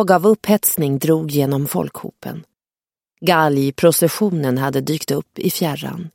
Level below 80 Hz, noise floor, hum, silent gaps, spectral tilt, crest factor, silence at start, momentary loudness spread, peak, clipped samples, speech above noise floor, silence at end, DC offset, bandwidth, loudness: -58 dBFS; under -90 dBFS; none; none; -5 dB/octave; 18 dB; 0 s; 13 LU; 0 dBFS; under 0.1%; over 73 dB; 0.05 s; under 0.1%; 17 kHz; -17 LUFS